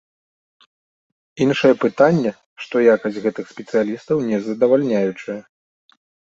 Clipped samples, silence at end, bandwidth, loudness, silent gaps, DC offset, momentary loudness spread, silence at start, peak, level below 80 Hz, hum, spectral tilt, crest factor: under 0.1%; 1 s; 7.6 kHz; -18 LUFS; 2.46-2.56 s; under 0.1%; 14 LU; 1.35 s; -2 dBFS; -62 dBFS; none; -7 dB/octave; 18 dB